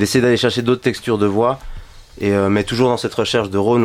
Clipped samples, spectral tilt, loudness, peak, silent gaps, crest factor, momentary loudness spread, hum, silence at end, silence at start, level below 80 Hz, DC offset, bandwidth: under 0.1%; -5.5 dB/octave; -17 LUFS; 0 dBFS; none; 16 dB; 4 LU; none; 0 s; 0 s; -40 dBFS; under 0.1%; 16 kHz